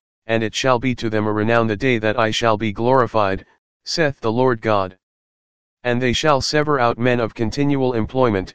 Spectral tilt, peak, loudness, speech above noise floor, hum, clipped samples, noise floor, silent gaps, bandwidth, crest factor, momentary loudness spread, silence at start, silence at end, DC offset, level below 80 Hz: -5.5 dB/octave; 0 dBFS; -19 LUFS; over 72 dB; none; under 0.1%; under -90 dBFS; 3.58-3.80 s, 5.03-5.77 s; 9.8 kHz; 18 dB; 6 LU; 0.2 s; 0 s; 2%; -44 dBFS